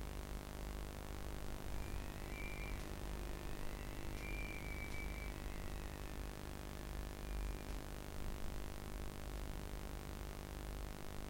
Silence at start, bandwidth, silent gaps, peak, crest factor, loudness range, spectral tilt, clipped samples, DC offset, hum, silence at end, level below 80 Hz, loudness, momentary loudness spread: 0 s; 16.5 kHz; none; -28 dBFS; 16 dB; 1 LU; -5 dB/octave; under 0.1%; under 0.1%; none; 0 s; -48 dBFS; -49 LUFS; 3 LU